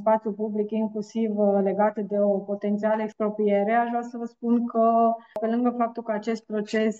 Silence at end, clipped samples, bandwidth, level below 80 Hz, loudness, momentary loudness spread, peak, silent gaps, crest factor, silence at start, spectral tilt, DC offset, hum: 0 s; under 0.1%; 7.8 kHz; -76 dBFS; -25 LUFS; 7 LU; -10 dBFS; none; 14 dB; 0 s; -7.5 dB/octave; under 0.1%; none